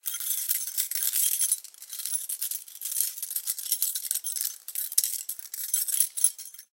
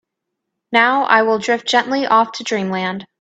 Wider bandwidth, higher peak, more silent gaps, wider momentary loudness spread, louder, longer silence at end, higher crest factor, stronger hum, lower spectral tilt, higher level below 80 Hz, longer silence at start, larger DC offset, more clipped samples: first, 17.5 kHz vs 9 kHz; about the same, -2 dBFS vs 0 dBFS; neither; about the same, 10 LU vs 8 LU; second, -27 LUFS vs -16 LUFS; about the same, 0.1 s vs 0.15 s; first, 28 dB vs 18 dB; neither; second, 8.5 dB/octave vs -4 dB/octave; second, under -90 dBFS vs -66 dBFS; second, 0.05 s vs 0.7 s; neither; neither